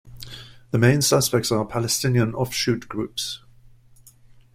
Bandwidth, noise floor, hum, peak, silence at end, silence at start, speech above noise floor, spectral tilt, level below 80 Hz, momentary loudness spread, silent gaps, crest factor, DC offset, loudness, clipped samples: 16 kHz; -51 dBFS; none; -4 dBFS; 1.15 s; 0.05 s; 30 dB; -4.5 dB/octave; -50 dBFS; 20 LU; none; 20 dB; under 0.1%; -22 LUFS; under 0.1%